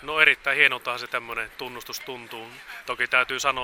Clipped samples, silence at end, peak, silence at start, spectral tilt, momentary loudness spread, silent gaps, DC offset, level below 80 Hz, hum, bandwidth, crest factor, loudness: under 0.1%; 0 s; 0 dBFS; 0 s; -1 dB/octave; 19 LU; none; under 0.1%; -58 dBFS; none; 17.5 kHz; 24 dB; -22 LUFS